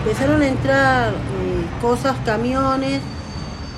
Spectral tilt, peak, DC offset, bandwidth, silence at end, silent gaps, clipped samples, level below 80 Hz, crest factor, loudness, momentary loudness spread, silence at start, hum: -6 dB/octave; -4 dBFS; under 0.1%; 13.5 kHz; 0 s; none; under 0.1%; -34 dBFS; 14 dB; -19 LUFS; 12 LU; 0 s; none